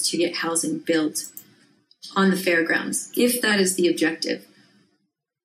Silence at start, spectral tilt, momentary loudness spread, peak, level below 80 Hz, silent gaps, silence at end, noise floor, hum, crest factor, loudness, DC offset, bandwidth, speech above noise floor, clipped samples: 0 s; -3.5 dB/octave; 9 LU; -8 dBFS; -78 dBFS; none; 1.05 s; -74 dBFS; none; 16 dB; -22 LUFS; under 0.1%; 15.5 kHz; 52 dB; under 0.1%